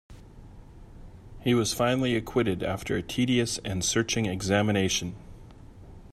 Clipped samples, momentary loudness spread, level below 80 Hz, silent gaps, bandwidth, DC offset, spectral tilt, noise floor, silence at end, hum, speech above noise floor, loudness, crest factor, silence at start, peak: under 0.1%; 6 LU; -48 dBFS; none; 15.5 kHz; under 0.1%; -4.5 dB/octave; -47 dBFS; 0.05 s; none; 21 dB; -27 LUFS; 20 dB; 0.1 s; -10 dBFS